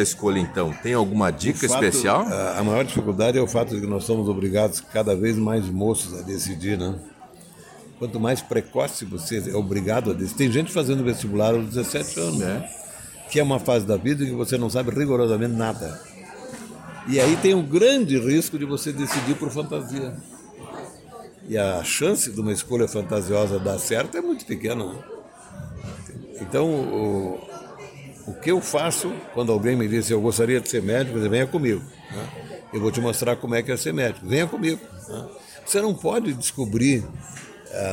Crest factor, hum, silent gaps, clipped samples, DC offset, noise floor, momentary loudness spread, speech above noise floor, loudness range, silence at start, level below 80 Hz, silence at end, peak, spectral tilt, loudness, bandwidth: 18 dB; none; none; under 0.1%; under 0.1%; -46 dBFS; 17 LU; 23 dB; 6 LU; 0 s; -52 dBFS; 0 s; -6 dBFS; -5 dB/octave; -23 LUFS; 17 kHz